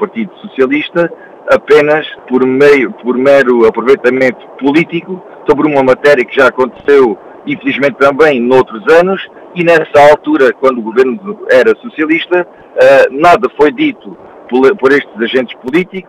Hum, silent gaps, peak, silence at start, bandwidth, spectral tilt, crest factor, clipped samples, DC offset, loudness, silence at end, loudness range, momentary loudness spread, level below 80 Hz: none; none; 0 dBFS; 0 s; 12 kHz; -6 dB/octave; 10 dB; 2%; under 0.1%; -9 LUFS; 0.05 s; 2 LU; 10 LU; -46 dBFS